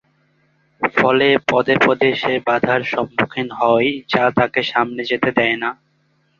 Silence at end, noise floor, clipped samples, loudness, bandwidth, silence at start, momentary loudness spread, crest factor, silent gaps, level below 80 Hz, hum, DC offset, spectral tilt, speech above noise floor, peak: 0.65 s; -62 dBFS; under 0.1%; -17 LUFS; 7.2 kHz; 0.8 s; 6 LU; 18 dB; none; -56 dBFS; none; under 0.1%; -6 dB/octave; 45 dB; 0 dBFS